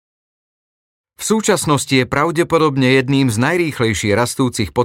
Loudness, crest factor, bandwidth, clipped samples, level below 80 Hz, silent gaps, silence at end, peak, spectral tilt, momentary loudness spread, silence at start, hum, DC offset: -16 LUFS; 14 dB; 17 kHz; under 0.1%; -46 dBFS; none; 0 s; -2 dBFS; -5 dB/octave; 4 LU; 1.2 s; none; under 0.1%